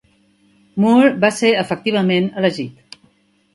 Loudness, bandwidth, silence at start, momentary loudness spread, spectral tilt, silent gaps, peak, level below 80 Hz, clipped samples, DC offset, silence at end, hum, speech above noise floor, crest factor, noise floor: -16 LUFS; 11.5 kHz; 0.75 s; 14 LU; -5.5 dB/octave; none; 0 dBFS; -62 dBFS; under 0.1%; under 0.1%; 0.85 s; none; 41 dB; 18 dB; -57 dBFS